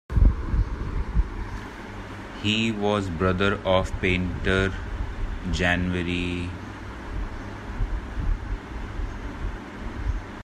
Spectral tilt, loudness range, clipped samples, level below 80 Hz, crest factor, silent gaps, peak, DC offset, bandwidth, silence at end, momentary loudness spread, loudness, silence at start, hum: -6 dB/octave; 9 LU; under 0.1%; -30 dBFS; 20 dB; none; -6 dBFS; under 0.1%; 9.8 kHz; 0 s; 14 LU; -27 LUFS; 0.1 s; none